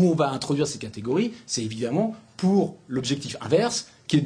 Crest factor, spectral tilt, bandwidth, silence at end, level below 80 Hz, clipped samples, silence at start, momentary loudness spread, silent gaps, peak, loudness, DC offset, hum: 18 dB; -5.5 dB/octave; 10.5 kHz; 0 s; -62 dBFS; under 0.1%; 0 s; 7 LU; none; -8 dBFS; -25 LUFS; under 0.1%; none